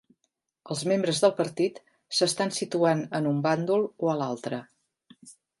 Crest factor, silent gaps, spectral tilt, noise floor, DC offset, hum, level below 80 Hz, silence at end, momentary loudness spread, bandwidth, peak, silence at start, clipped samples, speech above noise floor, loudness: 20 dB; none; -4.5 dB/octave; -78 dBFS; under 0.1%; none; -76 dBFS; 0.3 s; 8 LU; 11.5 kHz; -8 dBFS; 0.65 s; under 0.1%; 52 dB; -27 LUFS